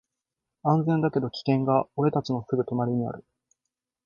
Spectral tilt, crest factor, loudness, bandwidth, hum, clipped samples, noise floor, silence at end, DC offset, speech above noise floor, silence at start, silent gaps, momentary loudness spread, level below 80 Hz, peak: -9 dB/octave; 20 dB; -26 LUFS; 7.2 kHz; none; under 0.1%; -86 dBFS; 0.85 s; under 0.1%; 61 dB; 0.65 s; none; 7 LU; -64 dBFS; -8 dBFS